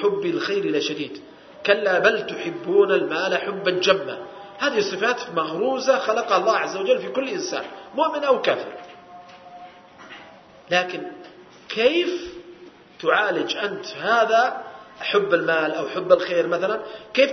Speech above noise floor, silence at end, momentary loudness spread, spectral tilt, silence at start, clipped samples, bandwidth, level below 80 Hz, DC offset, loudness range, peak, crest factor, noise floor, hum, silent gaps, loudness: 25 dB; 0 s; 17 LU; -3.5 dB/octave; 0 s; under 0.1%; 6.4 kHz; -68 dBFS; under 0.1%; 5 LU; 0 dBFS; 22 dB; -46 dBFS; none; none; -22 LUFS